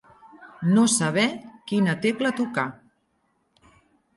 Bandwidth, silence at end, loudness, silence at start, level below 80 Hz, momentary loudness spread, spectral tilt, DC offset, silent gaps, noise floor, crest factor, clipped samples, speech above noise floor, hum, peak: 11.5 kHz; 1.45 s; -23 LUFS; 0.4 s; -68 dBFS; 10 LU; -4.5 dB/octave; under 0.1%; none; -70 dBFS; 18 dB; under 0.1%; 48 dB; none; -8 dBFS